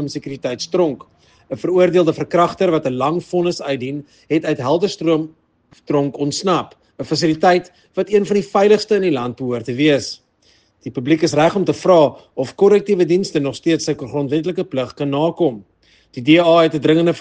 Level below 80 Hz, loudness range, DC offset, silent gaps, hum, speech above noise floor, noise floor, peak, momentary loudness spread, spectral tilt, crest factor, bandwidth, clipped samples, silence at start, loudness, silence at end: -58 dBFS; 4 LU; under 0.1%; none; none; 40 dB; -56 dBFS; 0 dBFS; 13 LU; -6 dB/octave; 16 dB; 9.6 kHz; under 0.1%; 0 s; -17 LUFS; 0 s